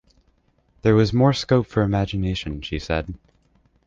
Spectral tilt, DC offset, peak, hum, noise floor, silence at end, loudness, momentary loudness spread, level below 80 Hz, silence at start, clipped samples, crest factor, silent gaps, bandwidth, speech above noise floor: -7 dB/octave; under 0.1%; -4 dBFS; none; -63 dBFS; 0.7 s; -21 LUFS; 11 LU; -38 dBFS; 0.85 s; under 0.1%; 18 dB; none; 7.6 kHz; 42 dB